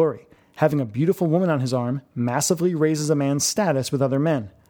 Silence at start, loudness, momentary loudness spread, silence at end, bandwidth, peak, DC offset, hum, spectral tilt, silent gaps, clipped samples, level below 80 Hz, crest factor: 0 s; -22 LUFS; 5 LU; 0.2 s; 19 kHz; -4 dBFS; under 0.1%; none; -5.5 dB/octave; none; under 0.1%; -62 dBFS; 18 dB